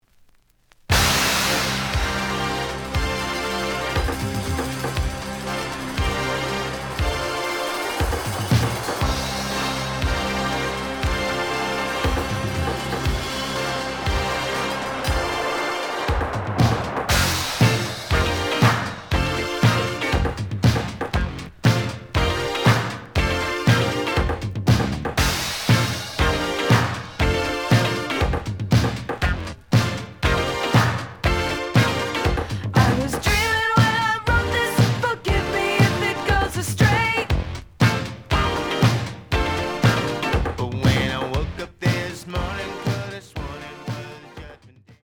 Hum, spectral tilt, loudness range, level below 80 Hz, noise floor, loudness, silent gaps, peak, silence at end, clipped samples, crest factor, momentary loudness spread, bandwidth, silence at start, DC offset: none; -4.5 dB/octave; 5 LU; -32 dBFS; -57 dBFS; -22 LUFS; none; -2 dBFS; 0.35 s; under 0.1%; 20 dB; 8 LU; over 20 kHz; 0.9 s; under 0.1%